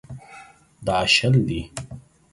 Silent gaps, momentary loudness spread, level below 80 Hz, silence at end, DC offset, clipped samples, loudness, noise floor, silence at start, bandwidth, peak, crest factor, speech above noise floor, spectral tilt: none; 24 LU; -46 dBFS; 0.35 s; under 0.1%; under 0.1%; -20 LUFS; -47 dBFS; 0.1 s; 11.5 kHz; -6 dBFS; 18 dB; 27 dB; -4.5 dB/octave